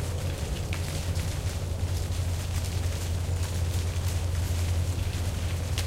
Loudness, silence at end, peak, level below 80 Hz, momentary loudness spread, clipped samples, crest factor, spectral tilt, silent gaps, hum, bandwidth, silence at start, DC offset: -30 LUFS; 0 s; -10 dBFS; -36 dBFS; 3 LU; under 0.1%; 18 dB; -5 dB/octave; none; none; 16 kHz; 0 s; under 0.1%